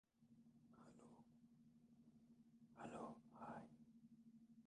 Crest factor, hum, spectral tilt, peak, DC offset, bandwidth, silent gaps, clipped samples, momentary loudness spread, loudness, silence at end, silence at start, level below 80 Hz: 20 dB; none; -6.5 dB/octave; -42 dBFS; under 0.1%; 10 kHz; none; under 0.1%; 13 LU; -61 LUFS; 0 s; 0.15 s; -90 dBFS